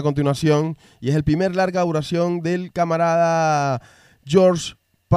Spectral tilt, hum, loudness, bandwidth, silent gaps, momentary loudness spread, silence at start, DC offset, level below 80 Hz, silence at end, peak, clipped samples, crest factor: -6.5 dB/octave; none; -20 LUFS; 13 kHz; none; 9 LU; 0 s; under 0.1%; -46 dBFS; 0 s; -2 dBFS; under 0.1%; 18 dB